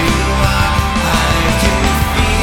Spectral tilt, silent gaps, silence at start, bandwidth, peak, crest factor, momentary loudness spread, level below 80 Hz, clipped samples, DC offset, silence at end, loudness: -4.5 dB/octave; none; 0 s; 18 kHz; -2 dBFS; 12 dB; 1 LU; -18 dBFS; under 0.1%; under 0.1%; 0 s; -13 LUFS